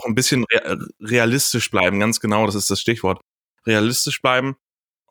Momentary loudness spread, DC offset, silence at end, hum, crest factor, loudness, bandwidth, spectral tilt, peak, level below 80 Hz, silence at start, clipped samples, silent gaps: 11 LU; under 0.1%; 0.55 s; none; 18 dB; -19 LUFS; over 20 kHz; -3.5 dB/octave; -2 dBFS; -56 dBFS; 0 s; under 0.1%; 3.27-3.55 s